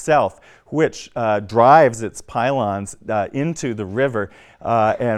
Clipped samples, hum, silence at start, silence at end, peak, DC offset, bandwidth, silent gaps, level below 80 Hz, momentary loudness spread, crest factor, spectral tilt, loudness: under 0.1%; none; 0 s; 0 s; 0 dBFS; under 0.1%; 12.5 kHz; none; -54 dBFS; 14 LU; 18 dB; -6 dB/octave; -19 LUFS